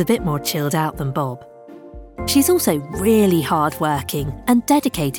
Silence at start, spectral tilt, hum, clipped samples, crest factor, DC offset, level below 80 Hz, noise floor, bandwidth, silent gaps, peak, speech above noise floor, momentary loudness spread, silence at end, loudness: 0 s; -5 dB/octave; none; under 0.1%; 14 dB; under 0.1%; -42 dBFS; -38 dBFS; 19.5 kHz; none; -4 dBFS; 20 dB; 9 LU; 0 s; -19 LUFS